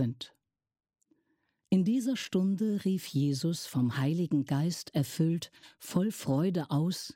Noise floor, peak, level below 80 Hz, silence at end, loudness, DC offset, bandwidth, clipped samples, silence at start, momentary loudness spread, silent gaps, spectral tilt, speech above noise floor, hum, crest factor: -77 dBFS; -16 dBFS; -72 dBFS; 0.05 s; -31 LUFS; under 0.1%; 17 kHz; under 0.1%; 0 s; 5 LU; none; -6.5 dB/octave; 47 dB; none; 16 dB